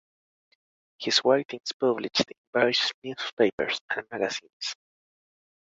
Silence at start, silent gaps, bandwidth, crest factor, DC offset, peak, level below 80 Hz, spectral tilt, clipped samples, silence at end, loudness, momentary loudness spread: 1 s; 1.45-1.49 s, 1.73-1.80 s, 2.38-2.53 s, 2.94-3.02 s, 3.33-3.37 s, 3.53-3.58 s, 3.81-3.88 s, 4.53-4.60 s; 8 kHz; 24 dB; under 0.1%; -6 dBFS; -70 dBFS; -3 dB/octave; under 0.1%; 0.85 s; -27 LUFS; 12 LU